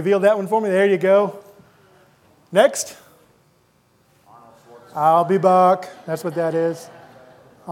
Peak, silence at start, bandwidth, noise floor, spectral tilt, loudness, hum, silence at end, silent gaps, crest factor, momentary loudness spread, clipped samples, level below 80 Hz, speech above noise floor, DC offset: 0 dBFS; 0 s; 16.5 kHz; -59 dBFS; -5 dB/octave; -18 LUFS; none; 0 s; none; 20 dB; 12 LU; under 0.1%; -74 dBFS; 42 dB; under 0.1%